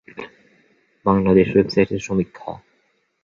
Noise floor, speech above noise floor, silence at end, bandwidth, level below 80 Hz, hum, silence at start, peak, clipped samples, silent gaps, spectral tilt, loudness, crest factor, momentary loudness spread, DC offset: -65 dBFS; 48 dB; 0.65 s; 7.4 kHz; -46 dBFS; none; 0.15 s; -2 dBFS; under 0.1%; none; -7.5 dB/octave; -19 LUFS; 20 dB; 22 LU; under 0.1%